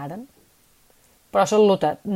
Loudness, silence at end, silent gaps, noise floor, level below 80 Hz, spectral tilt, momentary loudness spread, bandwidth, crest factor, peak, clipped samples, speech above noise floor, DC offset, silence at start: -19 LUFS; 0 s; none; -58 dBFS; -62 dBFS; -5.5 dB/octave; 19 LU; 15 kHz; 16 dB; -6 dBFS; under 0.1%; 38 dB; under 0.1%; 0 s